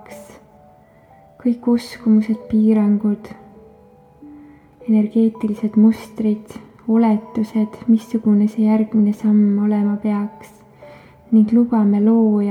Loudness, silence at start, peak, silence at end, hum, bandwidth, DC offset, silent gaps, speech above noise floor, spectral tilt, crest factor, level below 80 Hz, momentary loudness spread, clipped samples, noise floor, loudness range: -17 LUFS; 0.1 s; -4 dBFS; 0 s; none; 6.6 kHz; under 0.1%; none; 32 dB; -9 dB/octave; 14 dB; -58 dBFS; 8 LU; under 0.1%; -48 dBFS; 3 LU